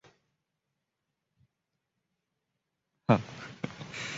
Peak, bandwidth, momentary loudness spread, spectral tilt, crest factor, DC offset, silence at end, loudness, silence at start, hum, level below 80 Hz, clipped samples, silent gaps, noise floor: -10 dBFS; 7.6 kHz; 13 LU; -5.5 dB/octave; 28 dB; under 0.1%; 0 s; -32 LUFS; 3.1 s; none; -66 dBFS; under 0.1%; none; -85 dBFS